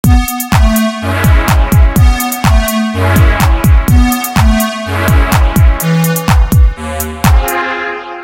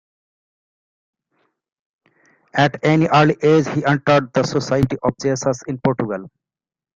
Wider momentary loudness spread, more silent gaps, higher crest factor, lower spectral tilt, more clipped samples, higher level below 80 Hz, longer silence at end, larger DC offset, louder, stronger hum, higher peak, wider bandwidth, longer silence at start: second, 5 LU vs 8 LU; neither; second, 8 dB vs 18 dB; about the same, -5.5 dB/octave vs -6 dB/octave; first, 0.3% vs under 0.1%; first, -12 dBFS vs -50 dBFS; second, 0 s vs 0.65 s; first, 0.2% vs under 0.1%; first, -11 LUFS vs -18 LUFS; neither; about the same, 0 dBFS vs -2 dBFS; first, 17.5 kHz vs 7.6 kHz; second, 0.05 s vs 2.55 s